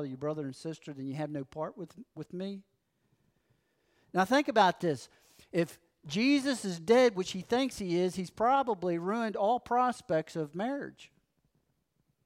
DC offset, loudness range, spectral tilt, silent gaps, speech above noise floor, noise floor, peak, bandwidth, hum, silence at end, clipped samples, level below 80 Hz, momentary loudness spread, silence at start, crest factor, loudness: under 0.1%; 12 LU; -5.5 dB/octave; none; 46 dB; -77 dBFS; -12 dBFS; 16 kHz; none; 1.2 s; under 0.1%; -70 dBFS; 15 LU; 0 s; 20 dB; -31 LUFS